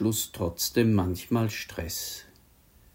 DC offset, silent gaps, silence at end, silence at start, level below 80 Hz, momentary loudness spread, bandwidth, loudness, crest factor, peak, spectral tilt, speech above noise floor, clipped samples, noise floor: under 0.1%; none; 0.7 s; 0 s; -54 dBFS; 10 LU; 16.5 kHz; -28 LUFS; 20 dB; -10 dBFS; -5 dB/octave; 31 dB; under 0.1%; -58 dBFS